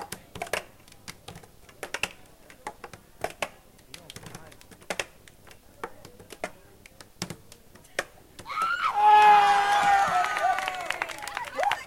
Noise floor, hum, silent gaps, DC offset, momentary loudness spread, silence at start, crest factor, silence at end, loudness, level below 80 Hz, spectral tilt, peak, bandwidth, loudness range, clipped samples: -52 dBFS; none; none; under 0.1%; 26 LU; 0 s; 20 dB; 0 s; -24 LUFS; -60 dBFS; -2 dB/octave; -8 dBFS; 16.5 kHz; 18 LU; under 0.1%